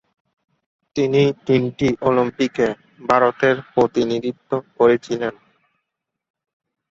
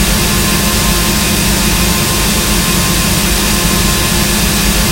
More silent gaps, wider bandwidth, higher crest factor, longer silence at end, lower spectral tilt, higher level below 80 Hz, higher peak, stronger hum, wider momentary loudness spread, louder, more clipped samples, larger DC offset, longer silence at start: neither; second, 7.8 kHz vs 16.5 kHz; first, 20 dB vs 12 dB; first, 1.6 s vs 0 s; first, -6.5 dB/octave vs -3 dB/octave; second, -54 dBFS vs -18 dBFS; about the same, -2 dBFS vs 0 dBFS; neither; first, 9 LU vs 0 LU; second, -19 LUFS vs -10 LUFS; neither; neither; first, 0.95 s vs 0 s